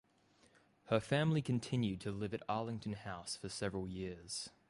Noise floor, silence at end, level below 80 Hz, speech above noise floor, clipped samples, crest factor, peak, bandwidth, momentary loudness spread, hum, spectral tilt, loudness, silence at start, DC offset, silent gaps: -71 dBFS; 0.2 s; -64 dBFS; 32 dB; under 0.1%; 20 dB; -20 dBFS; 11.5 kHz; 10 LU; none; -5.5 dB/octave; -39 LUFS; 0.85 s; under 0.1%; none